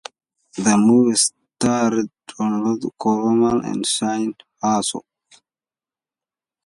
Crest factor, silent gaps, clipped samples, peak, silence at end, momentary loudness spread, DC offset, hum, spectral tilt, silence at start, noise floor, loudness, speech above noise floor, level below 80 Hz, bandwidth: 16 dB; none; under 0.1%; -4 dBFS; 1.65 s; 12 LU; under 0.1%; none; -4 dB/octave; 0.55 s; under -90 dBFS; -19 LUFS; over 72 dB; -58 dBFS; 11.5 kHz